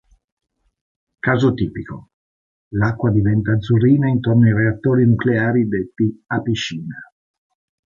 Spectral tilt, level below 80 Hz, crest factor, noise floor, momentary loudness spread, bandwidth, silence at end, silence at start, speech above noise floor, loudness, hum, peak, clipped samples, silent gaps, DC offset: -8 dB/octave; -44 dBFS; 16 dB; under -90 dBFS; 14 LU; 7.4 kHz; 0.9 s; 1.25 s; over 73 dB; -18 LUFS; none; -4 dBFS; under 0.1%; 2.14-2.71 s; under 0.1%